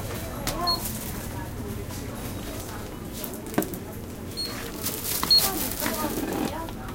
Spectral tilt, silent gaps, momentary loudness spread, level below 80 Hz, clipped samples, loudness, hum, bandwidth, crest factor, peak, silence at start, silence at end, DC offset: -3 dB/octave; none; 15 LU; -42 dBFS; under 0.1%; -27 LUFS; none; 17 kHz; 24 dB; -6 dBFS; 0 s; 0 s; under 0.1%